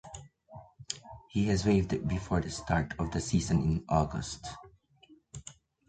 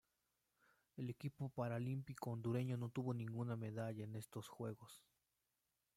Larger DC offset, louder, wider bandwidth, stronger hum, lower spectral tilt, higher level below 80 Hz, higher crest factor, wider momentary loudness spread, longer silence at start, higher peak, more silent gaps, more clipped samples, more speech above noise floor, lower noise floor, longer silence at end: neither; first, -31 LUFS vs -47 LUFS; second, 9.4 kHz vs 15.5 kHz; neither; second, -6 dB/octave vs -7.5 dB/octave; first, -46 dBFS vs -82 dBFS; about the same, 20 dB vs 18 dB; first, 22 LU vs 10 LU; second, 0.05 s vs 0.95 s; first, -12 dBFS vs -30 dBFS; neither; neither; second, 32 dB vs 43 dB; second, -61 dBFS vs -89 dBFS; second, 0.35 s vs 0.95 s